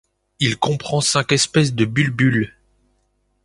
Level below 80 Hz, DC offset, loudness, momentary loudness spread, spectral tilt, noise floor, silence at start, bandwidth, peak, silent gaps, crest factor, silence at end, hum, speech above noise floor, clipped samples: -52 dBFS; under 0.1%; -18 LUFS; 5 LU; -4.5 dB/octave; -66 dBFS; 0.4 s; 11.5 kHz; -2 dBFS; none; 18 dB; 0.95 s; 50 Hz at -35 dBFS; 48 dB; under 0.1%